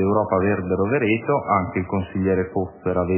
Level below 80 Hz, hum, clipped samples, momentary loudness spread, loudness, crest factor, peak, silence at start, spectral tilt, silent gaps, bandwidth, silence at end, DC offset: -42 dBFS; none; under 0.1%; 5 LU; -22 LUFS; 16 dB; -6 dBFS; 0 s; -11.5 dB/octave; none; 3.2 kHz; 0 s; under 0.1%